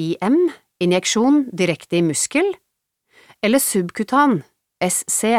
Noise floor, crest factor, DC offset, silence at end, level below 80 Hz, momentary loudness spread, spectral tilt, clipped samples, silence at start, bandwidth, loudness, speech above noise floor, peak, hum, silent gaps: -72 dBFS; 16 dB; under 0.1%; 0 s; -66 dBFS; 7 LU; -4 dB/octave; under 0.1%; 0 s; 16.5 kHz; -18 LUFS; 54 dB; -4 dBFS; none; none